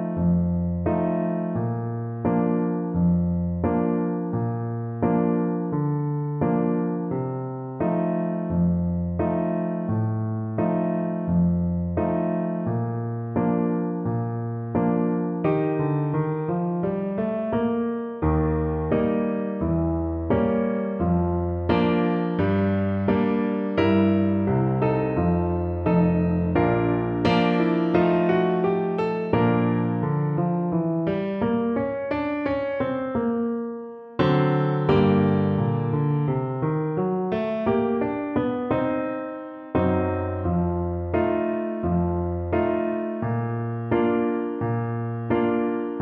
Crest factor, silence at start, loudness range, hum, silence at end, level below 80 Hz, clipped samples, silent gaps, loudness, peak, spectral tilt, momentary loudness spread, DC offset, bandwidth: 16 dB; 0 s; 3 LU; none; 0 s; -44 dBFS; under 0.1%; none; -24 LUFS; -8 dBFS; -10.5 dB/octave; 6 LU; under 0.1%; 5.2 kHz